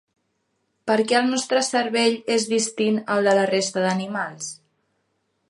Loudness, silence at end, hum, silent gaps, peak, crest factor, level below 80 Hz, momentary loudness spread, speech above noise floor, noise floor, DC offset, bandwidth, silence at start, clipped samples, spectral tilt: -21 LUFS; 0.95 s; none; none; -6 dBFS; 16 dB; -74 dBFS; 10 LU; 51 dB; -72 dBFS; under 0.1%; 11.5 kHz; 0.85 s; under 0.1%; -3.5 dB/octave